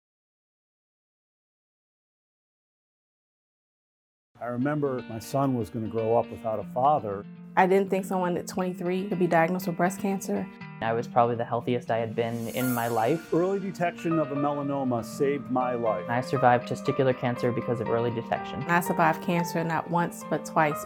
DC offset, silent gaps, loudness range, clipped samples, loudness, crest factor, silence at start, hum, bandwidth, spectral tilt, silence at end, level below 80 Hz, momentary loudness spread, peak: under 0.1%; none; 4 LU; under 0.1%; -27 LUFS; 22 dB; 4.4 s; none; 18 kHz; -6.5 dB/octave; 0 s; -68 dBFS; 8 LU; -6 dBFS